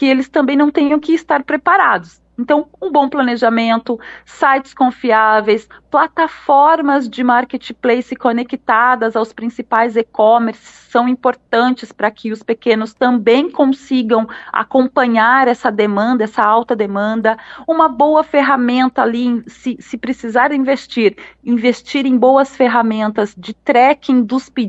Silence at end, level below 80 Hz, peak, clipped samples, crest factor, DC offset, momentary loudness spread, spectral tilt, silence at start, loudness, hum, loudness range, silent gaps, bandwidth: 0 s; -58 dBFS; 0 dBFS; under 0.1%; 14 dB; under 0.1%; 9 LU; -5.5 dB/octave; 0 s; -14 LUFS; none; 2 LU; none; 8 kHz